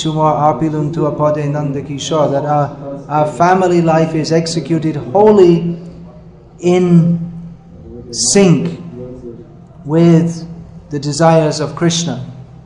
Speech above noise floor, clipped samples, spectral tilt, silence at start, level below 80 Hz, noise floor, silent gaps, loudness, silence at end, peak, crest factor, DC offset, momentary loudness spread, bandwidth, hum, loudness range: 25 dB; 0.2%; -6 dB/octave; 0 s; -44 dBFS; -37 dBFS; none; -13 LUFS; 0.15 s; 0 dBFS; 14 dB; under 0.1%; 20 LU; 10.5 kHz; none; 3 LU